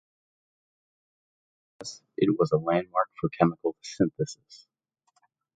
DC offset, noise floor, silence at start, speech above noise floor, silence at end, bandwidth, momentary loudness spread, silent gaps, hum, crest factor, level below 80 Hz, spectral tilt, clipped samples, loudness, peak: under 0.1%; -73 dBFS; 1.8 s; 46 dB; 1 s; 9.2 kHz; 16 LU; none; none; 24 dB; -64 dBFS; -6.5 dB/octave; under 0.1%; -27 LUFS; -6 dBFS